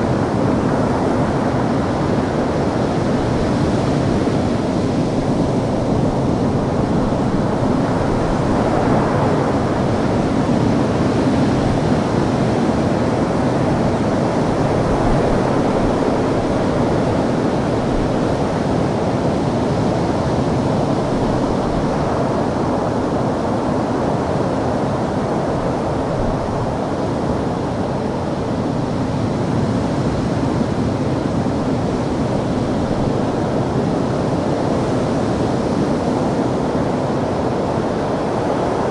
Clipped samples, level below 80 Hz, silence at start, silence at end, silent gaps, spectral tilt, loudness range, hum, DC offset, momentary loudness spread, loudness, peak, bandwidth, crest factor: under 0.1%; -34 dBFS; 0 s; 0 s; none; -7.5 dB/octave; 3 LU; none; under 0.1%; 3 LU; -18 LUFS; -4 dBFS; 11.5 kHz; 14 dB